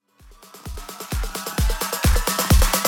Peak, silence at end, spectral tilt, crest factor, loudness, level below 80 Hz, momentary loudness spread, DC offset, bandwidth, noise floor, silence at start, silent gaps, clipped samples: -6 dBFS; 0 s; -3.5 dB/octave; 16 dB; -22 LUFS; -24 dBFS; 18 LU; under 0.1%; 17.5 kHz; -49 dBFS; 0.4 s; none; under 0.1%